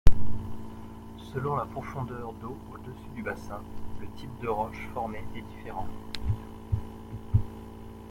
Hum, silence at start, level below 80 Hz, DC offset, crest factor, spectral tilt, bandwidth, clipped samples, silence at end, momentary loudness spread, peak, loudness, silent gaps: none; 0.05 s; -36 dBFS; under 0.1%; 24 dB; -7.5 dB/octave; 10.5 kHz; under 0.1%; 0 s; 13 LU; -2 dBFS; -36 LUFS; none